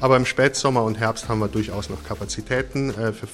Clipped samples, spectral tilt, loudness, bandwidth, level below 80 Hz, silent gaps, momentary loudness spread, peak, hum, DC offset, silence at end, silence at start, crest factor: under 0.1%; -5 dB/octave; -23 LUFS; 15.5 kHz; -42 dBFS; none; 11 LU; -4 dBFS; none; under 0.1%; 0 s; 0 s; 18 dB